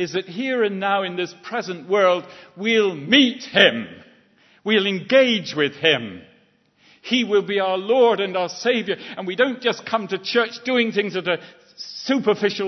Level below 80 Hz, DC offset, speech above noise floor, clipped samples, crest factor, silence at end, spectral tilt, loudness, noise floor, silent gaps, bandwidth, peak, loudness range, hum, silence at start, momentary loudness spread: -72 dBFS; under 0.1%; 38 dB; under 0.1%; 22 dB; 0 s; -4.5 dB/octave; -20 LUFS; -59 dBFS; none; 6.2 kHz; 0 dBFS; 4 LU; none; 0 s; 12 LU